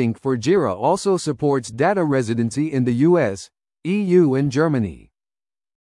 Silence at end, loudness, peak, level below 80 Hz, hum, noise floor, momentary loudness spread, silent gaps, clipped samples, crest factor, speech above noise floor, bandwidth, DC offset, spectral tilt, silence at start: 0.85 s; -19 LUFS; -4 dBFS; -56 dBFS; none; under -90 dBFS; 8 LU; none; under 0.1%; 14 dB; over 71 dB; 11.5 kHz; under 0.1%; -7 dB/octave; 0 s